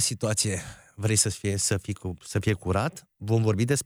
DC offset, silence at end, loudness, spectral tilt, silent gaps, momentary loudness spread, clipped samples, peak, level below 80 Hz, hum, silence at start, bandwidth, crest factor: under 0.1%; 0 s; -26 LUFS; -4 dB/octave; none; 11 LU; under 0.1%; -8 dBFS; -52 dBFS; none; 0 s; 16 kHz; 18 dB